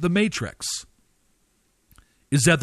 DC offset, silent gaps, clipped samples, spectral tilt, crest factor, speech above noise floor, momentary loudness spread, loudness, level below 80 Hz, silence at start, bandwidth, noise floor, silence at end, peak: under 0.1%; none; under 0.1%; -4.5 dB/octave; 18 dB; 45 dB; 9 LU; -24 LUFS; -52 dBFS; 0 s; 13.5 kHz; -66 dBFS; 0 s; -6 dBFS